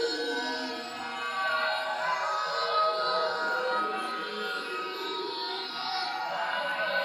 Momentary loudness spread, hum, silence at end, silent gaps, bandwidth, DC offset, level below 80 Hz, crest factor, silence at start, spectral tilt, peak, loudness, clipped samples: 6 LU; none; 0 s; none; 16.5 kHz; under 0.1%; -80 dBFS; 16 dB; 0 s; -2 dB/octave; -16 dBFS; -30 LUFS; under 0.1%